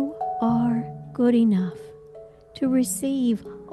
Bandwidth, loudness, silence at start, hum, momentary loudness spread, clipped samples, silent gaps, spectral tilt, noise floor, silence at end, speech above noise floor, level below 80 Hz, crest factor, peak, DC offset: 12.5 kHz; -23 LUFS; 0 s; none; 14 LU; under 0.1%; none; -6 dB/octave; -45 dBFS; 0 s; 24 dB; -58 dBFS; 14 dB; -10 dBFS; under 0.1%